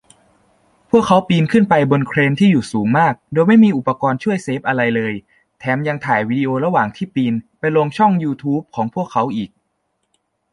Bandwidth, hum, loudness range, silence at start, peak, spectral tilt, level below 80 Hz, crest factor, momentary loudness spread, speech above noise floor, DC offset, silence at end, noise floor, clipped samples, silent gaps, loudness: 11 kHz; none; 5 LU; 0.95 s; -2 dBFS; -7.5 dB/octave; -54 dBFS; 14 dB; 8 LU; 54 dB; under 0.1%; 1.05 s; -69 dBFS; under 0.1%; none; -16 LUFS